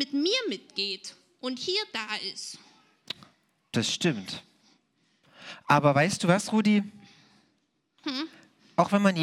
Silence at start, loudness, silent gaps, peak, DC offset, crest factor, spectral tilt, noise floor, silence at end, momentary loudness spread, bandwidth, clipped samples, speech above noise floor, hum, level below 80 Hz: 0 s; -27 LUFS; none; -6 dBFS; under 0.1%; 22 dB; -4.5 dB/octave; -73 dBFS; 0 s; 17 LU; 13 kHz; under 0.1%; 47 dB; none; -76 dBFS